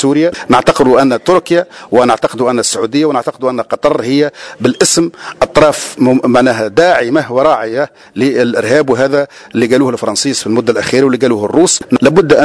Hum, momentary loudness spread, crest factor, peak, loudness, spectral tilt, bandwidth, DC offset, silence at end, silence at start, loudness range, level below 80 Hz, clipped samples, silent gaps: none; 6 LU; 10 dB; 0 dBFS; -11 LUFS; -4 dB/octave; 11 kHz; under 0.1%; 0 s; 0 s; 2 LU; -42 dBFS; 0.5%; none